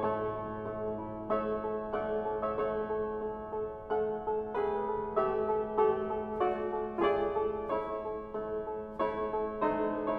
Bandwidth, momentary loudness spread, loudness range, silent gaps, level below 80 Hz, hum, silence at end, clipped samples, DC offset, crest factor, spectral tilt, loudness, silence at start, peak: 4.7 kHz; 8 LU; 3 LU; none; -56 dBFS; none; 0 s; under 0.1%; under 0.1%; 18 dB; -9 dB/octave; -34 LUFS; 0 s; -16 dBFS